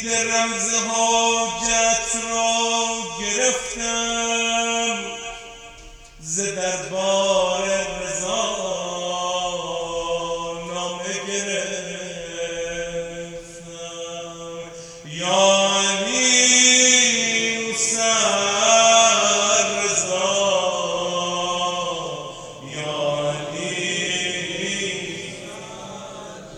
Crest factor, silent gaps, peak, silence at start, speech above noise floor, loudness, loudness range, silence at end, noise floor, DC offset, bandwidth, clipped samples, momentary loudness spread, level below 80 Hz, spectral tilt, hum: 22 dB; none; 0 dBFS; 0 s; 22 dB; -19 LUFS; 11 LU; 0 s; -42 dBFS; under 0.1%; 12.5 kHz; under 0.1%; 19 LU; -52 dBFS; -1 dB/octave; none